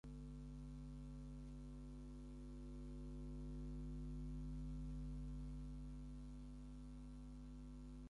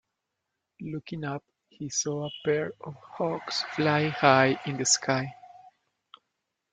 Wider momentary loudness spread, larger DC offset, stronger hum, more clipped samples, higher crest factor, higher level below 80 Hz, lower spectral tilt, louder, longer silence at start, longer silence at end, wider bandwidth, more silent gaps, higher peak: second, 6 LU vs 18 LU; neither; first, 50 Hz at -50 dBFS vs none; neither; second, 10 dB vs 26 dB; first, -54 dBFS vs -70 dBFS; first, -8 dB/octave vs -3.5 dB/octave; second, -54 LUFS vs -27 LUFS; second, 0.05 s vs 0.8 s; second, 0 s vs 1.05 s; about the same, 11 kHz vs 10 kHz; neither; second, -42 dBFS vs -4 dBFS